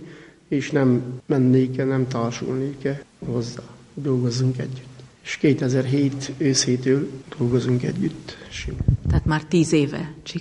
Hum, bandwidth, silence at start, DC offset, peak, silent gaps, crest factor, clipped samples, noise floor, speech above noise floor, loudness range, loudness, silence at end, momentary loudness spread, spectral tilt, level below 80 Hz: none; 10.5 kHz; 0 s; under 0.1%; -6 dBFS; none; 18 dB; under 0.1%; -43 dBFS; 22 dB; 3 LU; -22 LUFS; 0 s; 13 LU; -6 dB/octave; -38 dBFS